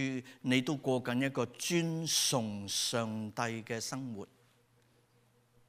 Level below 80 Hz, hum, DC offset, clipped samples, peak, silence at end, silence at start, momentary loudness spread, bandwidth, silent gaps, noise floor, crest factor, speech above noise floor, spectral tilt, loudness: -76 dBFS; none; under 0.1%; under 0.1%; -14 dBFS; 1.45 s; 0 s; 10 LU; 15.5 kHz; none; -69 dBFS; 22 dB; 35 dB; -3.5 dB/octave; -34 LUFS